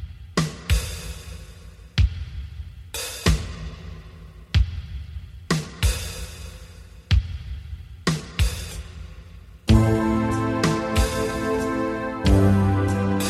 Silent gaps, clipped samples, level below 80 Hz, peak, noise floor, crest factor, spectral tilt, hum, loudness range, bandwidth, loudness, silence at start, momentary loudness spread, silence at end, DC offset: none; under 0.1%; -30 dBFS; -4 dBFS; -43 dBFS; 20 dB; -5.5 dB/octave; none; 7 LU; 15 kHz; -24 LUFS; 0 s; 21 LU; 0 s; under 0.1%